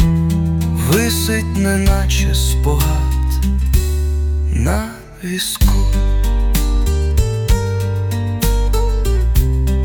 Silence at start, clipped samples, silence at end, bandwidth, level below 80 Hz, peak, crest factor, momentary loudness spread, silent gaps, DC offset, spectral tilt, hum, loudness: 0 s; under 0.1%; 0 s; 19 kHz; -16 dBFS; -2 dBFS; 12 dB; 4 LU; none; under 0.1%; -5.5 dB/octave; none; -17 LUFS